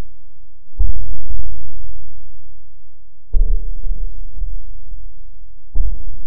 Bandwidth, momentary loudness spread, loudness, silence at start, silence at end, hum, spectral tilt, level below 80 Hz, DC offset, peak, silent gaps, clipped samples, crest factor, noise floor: 0.9 kHz; 22 LU; -29 LUFS; 0 s; 0 s; none; -15.5 dB/octave; -22 dBFS; 30%; 0 dBFS; none; under 0.1%; 10 dB; -36 dBFS